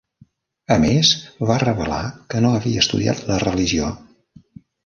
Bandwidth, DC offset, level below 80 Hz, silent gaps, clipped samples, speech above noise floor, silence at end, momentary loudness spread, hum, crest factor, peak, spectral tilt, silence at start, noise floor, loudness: 7.4 kHz; under 0.1%; -40 dBFS; none; under 0.1%; 36 dB; 0.85 s; 10 LU; none; 18 dB; -2 dBFS; -4.5 dB/octave; 0.7 s; -54 dBFS; -19 LUFS